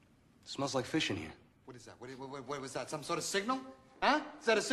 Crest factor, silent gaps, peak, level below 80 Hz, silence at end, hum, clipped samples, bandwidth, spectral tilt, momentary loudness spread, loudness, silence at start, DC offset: 20 dB; none; -16 dBFS; -68 dBFS; 0 s; none; under 0.1%; 13 kHz; -3.5 dB/octave; 22 LU; -36 LUFS; 0.45 s; under 0.1%